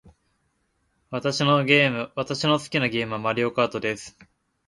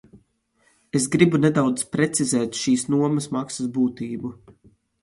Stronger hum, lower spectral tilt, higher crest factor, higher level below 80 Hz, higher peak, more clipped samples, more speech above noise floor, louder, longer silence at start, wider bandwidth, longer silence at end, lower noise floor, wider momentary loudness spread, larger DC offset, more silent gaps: neither; about the same, -5 dB/octave vs -5 dB/octave; about the same, 22 dB vs 20 dB; about the same, -62 dBFS vs -60 dBFS; about the same, -4 dBFS vs -2 dBFS; neither; first, 47 dB vs 43 dB; about the same, -23 LUFS vs -22 LUFS; first, 1.1 s vs 0.15 s; about the same, 11.5 kHz vs 11.5 kHz; about the same, 0.6 s vs 0.5 s; first, -71 dBFS vs -65 dBFS; about the same, 11 LU vs 11 LU; neither; neither